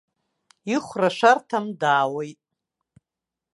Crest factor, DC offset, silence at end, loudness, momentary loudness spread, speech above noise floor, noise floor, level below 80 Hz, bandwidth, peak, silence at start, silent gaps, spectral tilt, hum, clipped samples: 22 dB; under 0.1%; 1.2 s; -22 LUFS; 15 LU; 66 dB; -87 dBFS; -74 dBFS; 11.5 kHz; -4 dBFS; 0.65 s; none; -4.5 dB/octave; none; under 0.1%